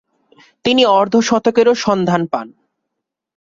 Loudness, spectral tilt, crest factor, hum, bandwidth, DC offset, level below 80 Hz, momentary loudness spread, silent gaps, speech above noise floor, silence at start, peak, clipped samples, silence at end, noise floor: -14 LUFS; -4.5 dB/octave; 14 dB; none; 7.6 kHz; under 0.1%; -56 dBFS; 10 LU; none; 64 dB; 0.65 s; -2 dBFS; under 0.1%; 0.95 s; -78 dBFS